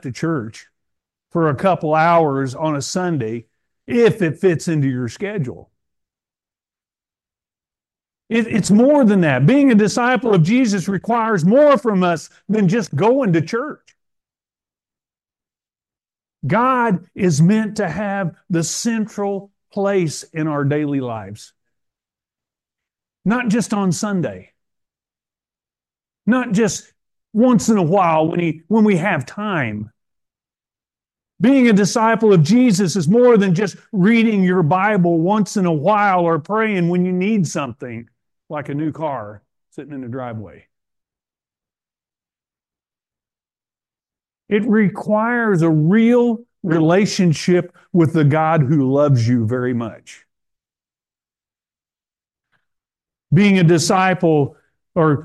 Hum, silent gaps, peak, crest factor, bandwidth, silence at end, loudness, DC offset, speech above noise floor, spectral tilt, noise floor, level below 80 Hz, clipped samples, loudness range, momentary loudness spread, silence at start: none; none; -4 dBFS; 14 dB; 12.5 kHz; 0 s; -17 LUFS; under 0.1%; over 74 dB; -6.5 dB/octave; under -90 dBFS; -60 dBFS; under 0.1%; 12 LU; 12 LU; 0.05 s